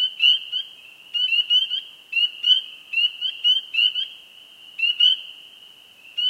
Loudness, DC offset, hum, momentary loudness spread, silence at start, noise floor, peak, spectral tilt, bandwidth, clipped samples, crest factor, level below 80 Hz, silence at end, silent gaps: -19 LUFS; under 0.1%; none; 12 LU; 0 s; -48 dBFS; -6 dBFS; 3 dB/octave; 15.5 kHz; under 0.1%; 18 dB; -86 dBFS; 0 s; none